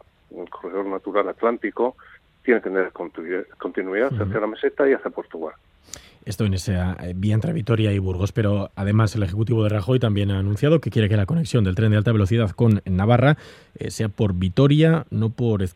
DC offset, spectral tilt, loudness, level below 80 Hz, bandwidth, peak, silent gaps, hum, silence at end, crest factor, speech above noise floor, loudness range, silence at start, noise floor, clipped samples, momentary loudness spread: under 0.1%; -7.5 dB/octave; -21 LUFS; -52 dBFS; 12 kHz; -4 dBFS; none; none; 0.05 s; 18 dB; 23 dB; 5 LU; 0.35 s; -44 dBFS; under 0.1%; 12 LU